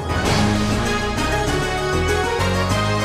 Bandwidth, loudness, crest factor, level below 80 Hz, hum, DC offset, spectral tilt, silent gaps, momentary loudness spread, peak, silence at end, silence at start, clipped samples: 15.5 kHz; -19 LUFS; 12 dB; -30 dBFS; none; 0.2%; -5 dB/octave; none; 3 LU; -6 dBFS; 0 s; 0 s; under 0.1%